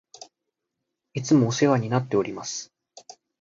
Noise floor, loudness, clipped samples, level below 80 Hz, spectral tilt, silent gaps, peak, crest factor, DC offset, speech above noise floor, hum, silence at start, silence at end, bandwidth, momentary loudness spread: -83 dBFS; -24 LUFS; under 0.1%; -64 dBFS; -5.5 dB/octave; none; -6 dBFS; 20 dB; under 0.1%; 60 dB; none; 0.2 s; 0.3 s; 7.8 kHz; 14 LU